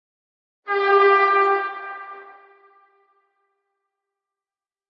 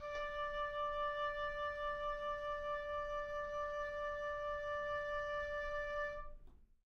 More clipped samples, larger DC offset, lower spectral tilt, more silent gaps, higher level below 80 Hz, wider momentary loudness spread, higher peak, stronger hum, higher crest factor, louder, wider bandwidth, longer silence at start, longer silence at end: neither; neither; about the same, -3 dB/octave vs -3.5 dB/octave; neither; second, under -90 dBFS vs -56 dBFS; first, 22 LU vs 3 LU; first, -4 dBFS vs -32 dBFS; neither; first, 20 dB vs 10 dB; first, -18 LUFS vs -42 LUFS; second, 5.8 kHz vs 6.8 kHz; first, 0.65 s vs 0 s; first, 2.65 s vs 0.25 s